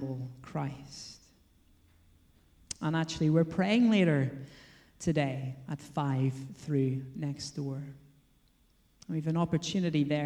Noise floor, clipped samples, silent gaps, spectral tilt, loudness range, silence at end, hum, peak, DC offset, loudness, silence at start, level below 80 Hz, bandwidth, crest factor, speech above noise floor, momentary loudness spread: -67 dBFS; under 0.1%; none; -6.5 dB/octave; 6 LU; 0 s; none; -14 dBFS; under 0.1%; -31 LUFS; 0 s; -62 dBFS; 11 kHz; 18 dB; 36 dB; 17 LU